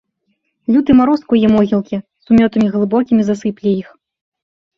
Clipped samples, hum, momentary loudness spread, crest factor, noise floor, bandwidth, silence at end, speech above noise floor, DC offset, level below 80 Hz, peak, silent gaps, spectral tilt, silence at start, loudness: under 0.1%; none; 9 LU; 14 dB; -67 dBFS; 7.2 kHz; 0.95 s; 54 dB; under 0.1%; -46 dBFS; -2 dBFS; none; -8 dB/octave; 0.7 s; -14 LUFS